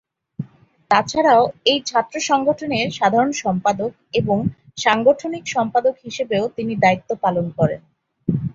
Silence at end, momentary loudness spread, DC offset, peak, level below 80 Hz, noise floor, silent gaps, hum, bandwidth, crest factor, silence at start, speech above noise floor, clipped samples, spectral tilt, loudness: 0 s; 10 LU; under 0.1%; 0 dBFS; -54 dBFS; -44 dBFS; none; none; 7.8 kHz; 18 dB; 0.4 s; 25 dB; under 0.1%; -5 dB/octave; -19 LUFS